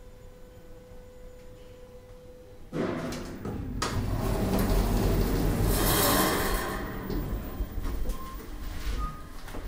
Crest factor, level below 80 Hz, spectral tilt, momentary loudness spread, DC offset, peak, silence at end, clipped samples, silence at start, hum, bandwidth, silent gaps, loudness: 18 dB; -34 dBFS; -4.5 dB/octave; 25 LU; under 0.1%; -10 dBFS; 0 s; under 0.1%; 0 s; none; 16 kHz; none; -30 LUFS